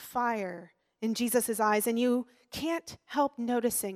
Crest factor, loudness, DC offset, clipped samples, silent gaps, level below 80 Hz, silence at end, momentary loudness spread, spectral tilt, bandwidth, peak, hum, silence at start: 16 dB; -30 LUFS; under 0.1%; under 0.1%; none; -70 dBFS; 0 s; 10 LU; -3.5 dB/octave; 16.5 kHz; -14 dBFS; none; 0 s